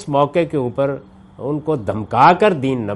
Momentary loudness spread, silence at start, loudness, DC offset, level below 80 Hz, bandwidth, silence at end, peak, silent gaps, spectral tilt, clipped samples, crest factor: 13 LU; 0 s; -17 LUFS; under 0.1%; -52 dBFS; 11.5 kHz; 0 s; 0 dBFS; none; -7.5 dB/octave; under 0.1%; 16 dB